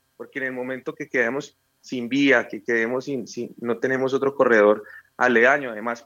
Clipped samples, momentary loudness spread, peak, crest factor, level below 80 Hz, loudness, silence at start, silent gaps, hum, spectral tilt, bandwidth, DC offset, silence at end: under 0.1%; 15 LU; -4 dBFS; 18 dB; -80 dBFS; -22 LUFS; 0.2 s; none; none; -5 dB/octave; 7.6 kHz; under 0.1%; 0.05 s